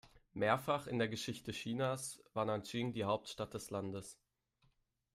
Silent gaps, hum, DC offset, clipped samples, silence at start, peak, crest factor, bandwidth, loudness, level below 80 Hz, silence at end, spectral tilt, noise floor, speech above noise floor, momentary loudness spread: none; none; under 0.1%; under 0.1%; 0.05 s; -20 dBFS; 22 dB; 15.5 kHz; -40 LUFS; -72 dBFS; 1 s; -5 dB/octave; -77 dBFS; 38 dB; 9 LU